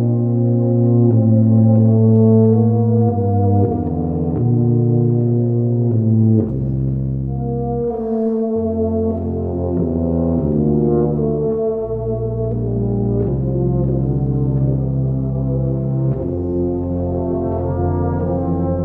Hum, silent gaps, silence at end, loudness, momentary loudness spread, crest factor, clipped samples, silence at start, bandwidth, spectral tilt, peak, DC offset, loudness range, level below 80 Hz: none; none; 0 s; -17 LUFS; 8 LU; 14 dB; under 0.1%; 0 s; 1.8 kHz; -15 dB/octave; -2 dBFS; under 0.1%; 6 LU; -32 dBFS